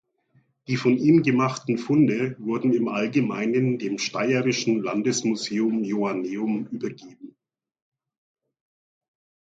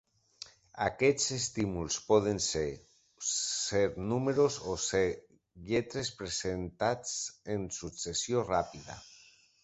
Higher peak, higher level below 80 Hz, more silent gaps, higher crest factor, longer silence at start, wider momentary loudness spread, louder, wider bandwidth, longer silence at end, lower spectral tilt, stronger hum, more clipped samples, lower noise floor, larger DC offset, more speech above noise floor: first, -8 dBFS vs -12 dBFS; second, -68 dBFS vs -56 dBFS; neither; about the same, 18 dB vs 20 dB; first, 0.7 s vs 0.4 s; second, 8 LU vs 18 LU; first, -23 LUFS vs -32 LUFS; about the same, 9 kHz vs 8.4 kHz; first, 2.2 s vs 0.5 s; first, -5.5 dB/octave vs -3.5 dB/octave; neither; neither; about the same, -64 dBFS vs -61 dBFS; neither; first, 41 dB vs 29 dB